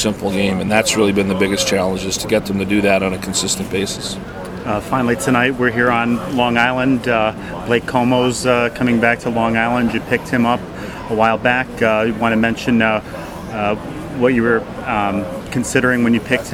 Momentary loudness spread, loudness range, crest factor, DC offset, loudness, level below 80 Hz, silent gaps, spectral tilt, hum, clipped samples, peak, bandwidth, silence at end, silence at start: 8 LU; 2 LU; 16 dB; under 0.1%; -17 LUFS; -40 dBFS; none; -4.5 dB/octave; none; under 0.1%; 0 dBFS; 16.5 kHz; 0 s; 0 s